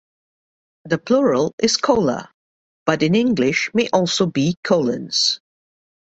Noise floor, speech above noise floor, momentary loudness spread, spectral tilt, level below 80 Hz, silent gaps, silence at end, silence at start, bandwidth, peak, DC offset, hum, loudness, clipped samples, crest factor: under -90 dBFS; over 72 dB; 7 LU; -4.5 dB/octave; -56 dBFS; 1.53-1.58 s, 2.34-2.86 s, 4.57-4.63 s; 0.75 s; 0.85 s; 8.2 kHz; -2 dBFS; under 0.1%; none; -18 LUFS; under 0.1%; 18 dB